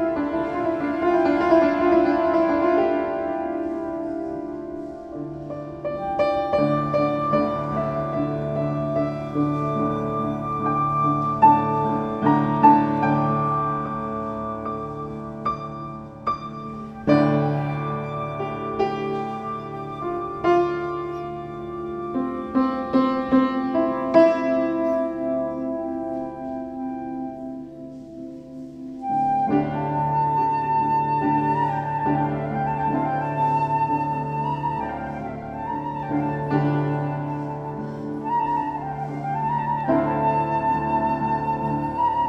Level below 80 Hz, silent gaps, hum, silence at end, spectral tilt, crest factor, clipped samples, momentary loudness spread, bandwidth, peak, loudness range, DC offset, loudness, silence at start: -50 dBFS; none; none; 0 s; -9 dB/octave; 20 dB; under 0.1%; 13 LU; 8 kHz; -2 dBFS; 7 LU; under 0.1%; -23 LUFS; 0 s